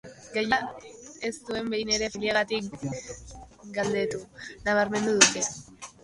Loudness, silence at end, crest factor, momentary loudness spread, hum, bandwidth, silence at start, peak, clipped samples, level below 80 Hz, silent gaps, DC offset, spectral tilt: -26 LUFS; 0.15 s; 26 dB; 23 LU; none; 11.5 kHz; 0.05 s; -2 dBFS; under 0.1%; -56 dBFS; none; under 0.1%; -2 dB/octave